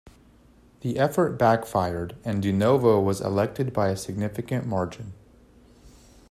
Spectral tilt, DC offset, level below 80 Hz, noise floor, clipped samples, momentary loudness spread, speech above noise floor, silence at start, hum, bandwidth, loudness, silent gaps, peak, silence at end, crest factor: -7 dB/octave; under 0.1%; -56 dBFS; -55 dBFS; under 0.1%; 11 LU; 31 dB; 0.85 s; none; 15 kHz; -25 LUFS; none; -6 dBFS; 0.4 s; 18 dB